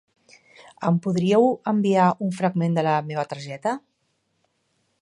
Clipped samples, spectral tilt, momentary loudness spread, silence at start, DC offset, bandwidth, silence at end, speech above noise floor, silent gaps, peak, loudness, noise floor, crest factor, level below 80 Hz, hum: under 0.1%; -7.5 dB/octave; 10 LU; 0.8 s; under 0.1%; 11 kHz; 1.25 s; 50 dB; none; -4 dBFS; -22 LUFS; -71 dBFS; 18 dB; -72 dBFS; none